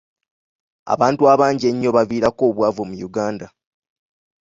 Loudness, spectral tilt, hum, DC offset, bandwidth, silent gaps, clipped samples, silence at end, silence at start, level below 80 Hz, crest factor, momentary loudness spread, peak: -18 LUFS; -6.5 dB/octave; none; under 0.1%; 7.8 kHz; none; under 0.1%; 0.95 s; 0.85 s; -56 dBFS; 18 dB; 12 LU; -2 dBFS